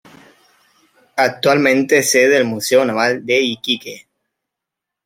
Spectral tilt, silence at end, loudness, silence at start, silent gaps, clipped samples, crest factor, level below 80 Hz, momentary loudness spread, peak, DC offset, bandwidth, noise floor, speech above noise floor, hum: -3 dB/octave; 1.1 s; -15 LUFS; 1.15 s; none; under 0.1%; 16 dB; -66 dBFS; 8 LU; -2 dBFS; under 0.1%; 16.5 kHz; -82 dBFS; 68 dB; none